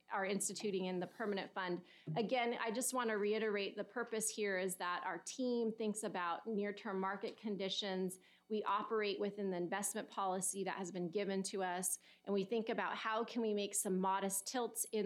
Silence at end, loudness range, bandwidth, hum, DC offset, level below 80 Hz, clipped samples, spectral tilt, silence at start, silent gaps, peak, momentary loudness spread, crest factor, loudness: 0 s; 2 LU; 16.5 kHz; none; under 0.1%; under -90 dBFS; under 0.1%; -3.5 dB/octave; 0.1 s; none; -24 dBFS; 5 LU; 16 dB; -40 LUFS